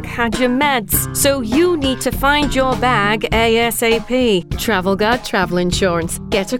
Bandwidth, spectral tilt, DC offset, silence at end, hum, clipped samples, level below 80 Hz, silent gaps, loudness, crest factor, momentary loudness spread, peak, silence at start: 18 kHz; -4 dB/octave; under 0.1%; 0 s; none; under 0.1%; -30 dBFS; none; -16 LUFS; 16 dB; 4 LU; 0 dBFS; 0 s